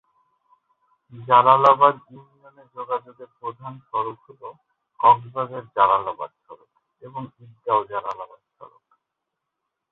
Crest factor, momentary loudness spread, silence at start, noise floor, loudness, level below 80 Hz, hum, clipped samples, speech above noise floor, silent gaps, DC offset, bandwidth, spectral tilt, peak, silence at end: 22 dB; 26 LU; 1.15 s; -82 dBFS; -20 LUFS; -68 dBFS; none; under 0.1%; 60 dB; none; under 0.1%; 6.8 kHz; -6.5 dB/octave; -2 dBFS; 1.25 s